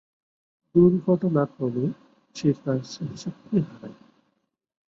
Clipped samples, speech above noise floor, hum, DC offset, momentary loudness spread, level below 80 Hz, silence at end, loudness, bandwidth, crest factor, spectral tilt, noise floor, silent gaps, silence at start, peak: under 0.1%; 51 dB; none; under 0.1%; 21 LU; -60 dBFS; 0.95 s; -24 LUFS; 7.6 kHz; 20 dB; -8.5 dB/octave; -75 dBFS; none; 0.75 s; -6 dBFS